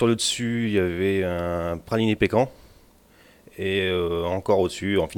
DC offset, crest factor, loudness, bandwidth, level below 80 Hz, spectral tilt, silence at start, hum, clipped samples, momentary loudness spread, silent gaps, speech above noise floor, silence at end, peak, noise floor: under 0.1%; 18 dB; -24 LUFS; 18 kHz; -48 dBFS; -5 dB/octave; 0 s; none; under 0.1%; 5 LU; none; 31 dB; 0 s; -6 dBFS; -54 dBFS